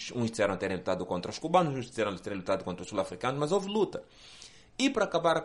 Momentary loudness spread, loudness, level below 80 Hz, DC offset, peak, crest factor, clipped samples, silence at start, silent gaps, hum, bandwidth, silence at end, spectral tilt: 16 LU; -31 LUFS; -62 dBFS; under 0.1%; -10 dBFS; 20 dB; under 0.1%; 0 s; none; none; 11.5 kHz; 0 s; -5 dB/octave